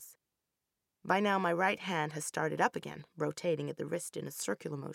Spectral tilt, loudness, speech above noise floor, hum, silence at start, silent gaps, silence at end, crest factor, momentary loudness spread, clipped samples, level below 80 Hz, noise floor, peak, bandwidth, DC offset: -4.5 dB/octave; -34 LUFS; 53 dB; none; 0 s; none; 0 s; 22 dB; 11 LU; under 0.1%; -80 dBFS; -87 dBFS; -14 dBFS; 17 kHz; under 0.1%